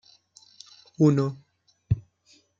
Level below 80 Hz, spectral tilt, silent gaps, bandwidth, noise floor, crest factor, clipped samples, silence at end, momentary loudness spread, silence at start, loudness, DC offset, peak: -50 dBFS; -8.5 dB/octave; none; 7.6 kHz; -62 dBFS; 20 dB; under 0.1%; 0.6 s; 26 LU; 1 s; -25 LUFS; under 0.1%; -8 dBFS